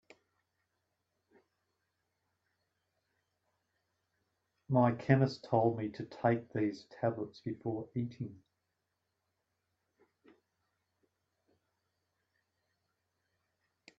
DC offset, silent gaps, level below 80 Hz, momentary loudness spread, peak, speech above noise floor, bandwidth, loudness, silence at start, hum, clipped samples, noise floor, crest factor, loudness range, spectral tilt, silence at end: under 0.1%; none; -76 dBFS; 12 LU; -12 dBFS; 52 dB; 7.6 kHz; -34 LUFS; 4.7 s; none; under 0.1%; -85 dBFS; 28 dB; 13 LU; -7.5 dB/octave; 5.65 s